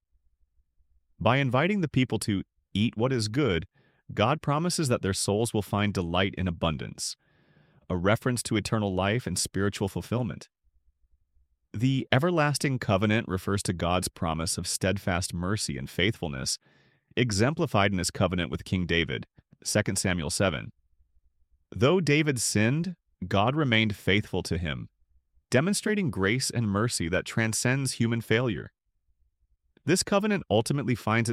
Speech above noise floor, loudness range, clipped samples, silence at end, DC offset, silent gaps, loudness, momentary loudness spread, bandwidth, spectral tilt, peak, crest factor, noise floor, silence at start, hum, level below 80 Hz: 44 dB; 3 LU; under 0.1%; 0 s; under 0.1%; none; -27 LUFS; 8 LU; 15.5 kHz; -4.5 dB/octave; -4 dBFS; 24 dB; -71 dBFS; 1.2 s; none; -52 dBFS